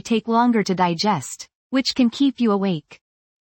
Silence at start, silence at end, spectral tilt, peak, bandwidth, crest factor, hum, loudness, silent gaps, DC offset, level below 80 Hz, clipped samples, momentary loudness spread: 0.05 s; 0.5 s; -5 dB/octave; -6 dBFS; 17 kHz; 16 dB; none; -20 LUFS; 1.55-1.70 s; under 0.1%; -62 dBFS; under 0.1%; 9 LU